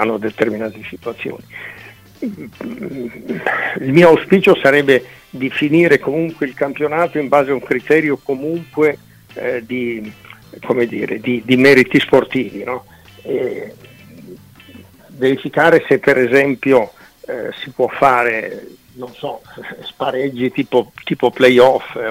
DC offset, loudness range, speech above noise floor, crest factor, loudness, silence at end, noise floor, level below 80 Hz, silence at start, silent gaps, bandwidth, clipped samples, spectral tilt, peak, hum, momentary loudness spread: under 0.1%; 8 LU; 26 dB; 16 dB; -15 LUFS; 0 s; -41 dBFS; -54 dBFS; 0 s; none; 16 kHz; under 0.1%; -6.5 dB/octave; 0 dBFS; none; 19 LU